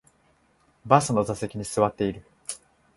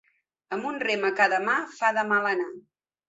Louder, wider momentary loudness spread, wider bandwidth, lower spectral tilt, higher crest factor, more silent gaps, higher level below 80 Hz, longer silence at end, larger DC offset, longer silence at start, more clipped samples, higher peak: about the same, -24 LUFS vs -25 LUFS; first, 17 LU vs 10 LU; first, 12 kHz vs 8 kHz; first, -5.5 dB/octave vs -4 dB/octave; first, 26 dB vs 20 dB; neither; first, -56 dBFS vs -78 dBFS; about the same, 0.4 s vs 0.5 s; neither; first, 0.85 s vs 0.5 s; neither; first, -2 dBFS vs -6 dBFS